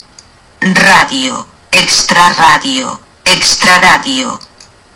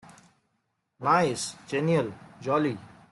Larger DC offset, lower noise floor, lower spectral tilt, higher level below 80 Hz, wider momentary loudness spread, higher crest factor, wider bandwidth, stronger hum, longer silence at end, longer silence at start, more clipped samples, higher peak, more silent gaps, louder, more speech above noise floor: neither; second, -40 dBFS vs -77 dBFS; second, -2 dB/octave vs -5.5 dB/octave; first, -40 dBFS vs -68 dBFS; about the same, 11 LU vs 12 LU; second, 10 dB vs 18 dB; first, over 20 kHz vs 12 kHz; neither; first, 0.55 s vs 0.25 s; second, 0.6 s vs 1 s; first, 1% vs under 0.1%; first, 0 dBFS vs -10 dBFS; neither; first, -7 LUFS vs -27 LUFS; second, 31 dB vs 51 dB